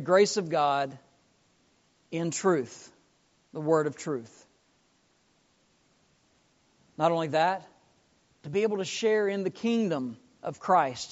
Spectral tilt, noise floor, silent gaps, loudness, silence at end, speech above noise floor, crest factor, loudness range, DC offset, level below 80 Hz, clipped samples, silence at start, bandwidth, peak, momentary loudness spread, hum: -4 dB/octave; -68 dBFS; none; -28 LUFS; 0 s; 41 dB; 22 dB; 6 LU; under 0.1%; -76 dBFS; under 0.1%; 0 s; 8 kHz; -8 dBFS; 14 LU; none